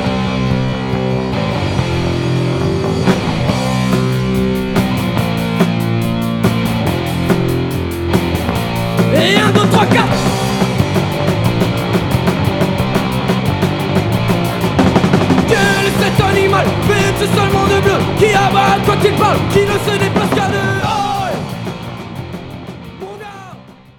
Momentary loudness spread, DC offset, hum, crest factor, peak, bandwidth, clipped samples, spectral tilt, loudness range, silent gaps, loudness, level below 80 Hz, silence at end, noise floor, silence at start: 7 LU; under 0.1%; none; 14 dB; 0 dBFS; 18.5 kHz; under 0.1%; -6 dB/octave; 4 LU; none; -14 LUFS; -32 dBFS; 0.25 s; -36 dBFS; 0 s